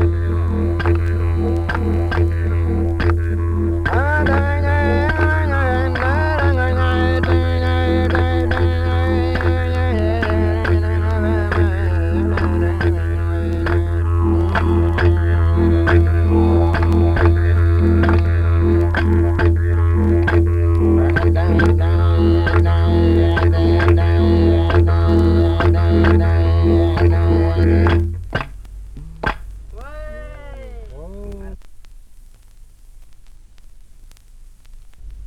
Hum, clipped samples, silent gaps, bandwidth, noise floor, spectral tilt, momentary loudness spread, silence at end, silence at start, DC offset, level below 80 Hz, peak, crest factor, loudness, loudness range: none; under 0.1%; none; 5.2 kHz; -42 dBFS; -9 dB/octave; 10 LU; 0 s; 0 s; under 0.1%; -22 dBFS; -2 dBFS; 14 dB; -16 LUFS; 4 LU